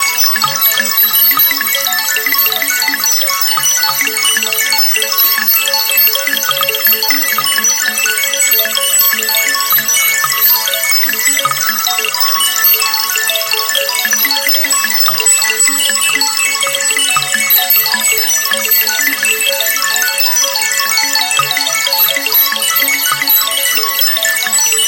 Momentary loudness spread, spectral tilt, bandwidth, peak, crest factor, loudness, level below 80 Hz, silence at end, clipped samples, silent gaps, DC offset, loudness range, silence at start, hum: 3 LU; 2 dB/octave; 18 kHz; 0 dBFS; 12 dB; -9 LUFS; -60 dBFS; 0 s; under 0.1%; none; under 0.1%; 1 LU; 0 s; none